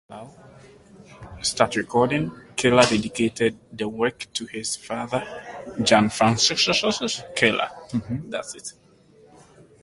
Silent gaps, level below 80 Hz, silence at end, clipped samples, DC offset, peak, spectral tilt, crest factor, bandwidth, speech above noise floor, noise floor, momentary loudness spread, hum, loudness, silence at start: none; -54 dBFS; 1.1 s; under 0.1%; under 0.1%; -2 dBFS; -3.5 dB/octave; 22 dB; 11.5 kHz; 30 dB; -53 dBFS; 17 LU; none; -22 LUFS; 0.1 s